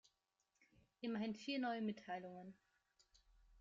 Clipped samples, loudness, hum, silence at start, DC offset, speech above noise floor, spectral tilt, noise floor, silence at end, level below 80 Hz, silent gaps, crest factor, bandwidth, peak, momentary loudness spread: under 0.1%; -46 LUFS; none; 1 s; under 0.1%; 41 dB; -3.5 dB/octave; -87 dBFS; 0 s; -80 dBFS; none; 16 dB; 7.6 kHz; -32 dBFS; 14 LU